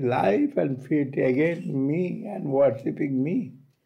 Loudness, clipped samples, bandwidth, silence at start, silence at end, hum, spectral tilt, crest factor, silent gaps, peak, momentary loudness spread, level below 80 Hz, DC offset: -25 LUFS; under 0.1%; 9.6 kHz; 0 s; 0.3 s; none; -9.5 dB/octave; 12 dB; none; -12 dBFS; 7 LU; -68 dBFS; under 0.1%